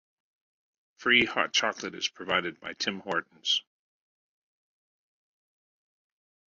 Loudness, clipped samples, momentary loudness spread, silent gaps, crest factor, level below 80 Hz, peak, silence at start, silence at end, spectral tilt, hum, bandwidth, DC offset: -28 LUFS; under 0.1%; 10 LU; none; 24 dB; -70 dBFS; -8 dBFS; 1 s; 2.95 s; -2 dB/octave; none; 7.6 kHz; under 0.1%